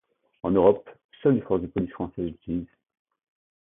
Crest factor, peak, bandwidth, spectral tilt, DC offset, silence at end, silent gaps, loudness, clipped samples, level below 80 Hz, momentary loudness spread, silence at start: 20 dB; -6 dBFS; 3.8 kHz; -12.5 dB/octave; under 0.1%; 1 s; 1.05-1.09 s; -26 LUFS; under 0.1%; -52 dBFS; 13 LU; 0.45 s